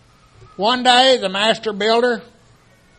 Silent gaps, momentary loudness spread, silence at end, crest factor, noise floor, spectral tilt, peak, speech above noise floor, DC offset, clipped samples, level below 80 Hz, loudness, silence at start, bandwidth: none; 9 LU; 0.75 s; 18 dB; -51 dBFS; -2.5 dB/octave; 0 dBFS; 35 dB; under 0.1%; under 0.1%; -58 dBFS; -16 LUFS; 0.6 s; 9.4 kHz